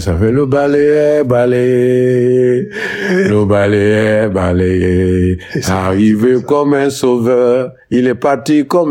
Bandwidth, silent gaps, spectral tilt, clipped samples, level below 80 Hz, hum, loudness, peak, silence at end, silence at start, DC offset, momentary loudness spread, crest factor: 16.5 kHz; none; -7 dB/octave; under 0.1%; -42 dBFS; none; -12 LUFS; -2 dBFS; 0 s; 0 s; under 0.1%; 4 LU; 10 dB